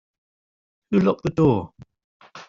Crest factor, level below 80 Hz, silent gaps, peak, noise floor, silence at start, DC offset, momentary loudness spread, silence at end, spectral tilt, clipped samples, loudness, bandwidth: 18 dB; -52 dBFS; 2.04-2.20 s; -6 dBFS; under -90 dBFS; 0.9 s; under 0.1%; 7 LU; 0.05 s; -8 dB/octave; under 0.1%; -21 LUFS; 7.4 kHz